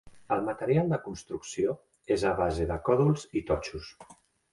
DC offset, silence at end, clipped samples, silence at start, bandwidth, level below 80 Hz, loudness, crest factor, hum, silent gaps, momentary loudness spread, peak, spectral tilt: under 0.1%; 0.4 s; under 0.1%; 0.05 s; 11.5 kHz; -48 dBFS; -29 LUFS; 18 dB; none; none; 13 LU; -12 dBFS; -6.5 dB/octave